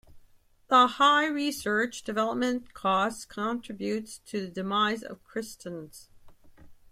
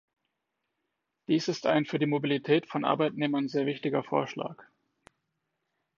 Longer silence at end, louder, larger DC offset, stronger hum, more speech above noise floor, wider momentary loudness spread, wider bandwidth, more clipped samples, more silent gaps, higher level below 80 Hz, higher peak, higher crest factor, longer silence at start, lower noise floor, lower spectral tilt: second, 0.2 s vs 1.4 s; about the same, -27 LUFS vs -29 LUFS; neither; neither; second, 31 dB vs 54 dB; first, 16 LU vs 7 LU; first, 16 kHz vs 7.4 kHz; neither; neither; first, -62 dBFS vs -78 dBFS; about the same, -10 dBFS vs -10 dBFS; about the same, 20 dB vs 20 dB; second, 0.1 s vs 1.3 s; second, -59 dBFS vs -83 dBFS; second, -3.5 dB/octave vs -6 dB/octave